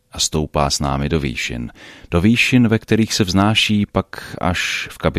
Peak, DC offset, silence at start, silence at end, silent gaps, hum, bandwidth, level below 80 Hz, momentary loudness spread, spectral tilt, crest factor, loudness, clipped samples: -2 dBFS; under 0.1%; 0.15 s; 0 s; none; none; 15.5 kHz; -34 dBFS; 10 LU; -4.5 dB/octave; 16 dB; -17 LUFS; under 0.1%